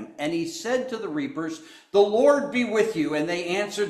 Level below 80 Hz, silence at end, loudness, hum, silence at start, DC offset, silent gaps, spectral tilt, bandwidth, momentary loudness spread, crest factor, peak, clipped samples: -68 dBFS; 0 s; -24 LUFS; none; 0 s; under 0.1%; none; -4.5 dB/octave; 13.5 kHz; 11 LU; 18 dB; -6 dBFS; under 0.1%